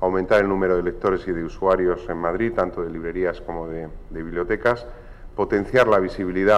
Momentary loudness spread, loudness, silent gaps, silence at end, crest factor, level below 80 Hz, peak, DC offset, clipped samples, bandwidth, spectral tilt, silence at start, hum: 12 LU; -22 LUFS; none; 0 s; 16 dB; -38 dBFS; -6 dBFS; under 0.1%; under 0.1%; 11 kHz; -7 dB/octave; 0 s; none